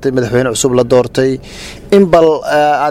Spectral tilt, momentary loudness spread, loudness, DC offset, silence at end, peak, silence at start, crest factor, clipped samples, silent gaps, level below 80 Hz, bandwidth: -5 dB/octave; 11 LU; -11 LUFS; under 0.1%; 0 s; 0 dBFS; 0 s; 12 dB; 0.3%; none; -38 dBFS; 15.5 kHz